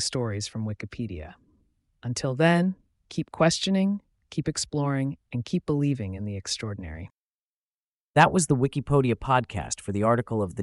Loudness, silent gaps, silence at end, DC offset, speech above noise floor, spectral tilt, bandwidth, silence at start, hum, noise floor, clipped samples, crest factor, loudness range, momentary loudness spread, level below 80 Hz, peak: -26 LUFS; 7.18-8.14 s; 0 s; under 0.1%; over 64 dB; -5 dB/octave; 11.5 kHz; 0 s; none; under -90 dBFS; under 0.1%; 22 dB; 5 LU; 14 LU; -50 dBFS; -6 dBFS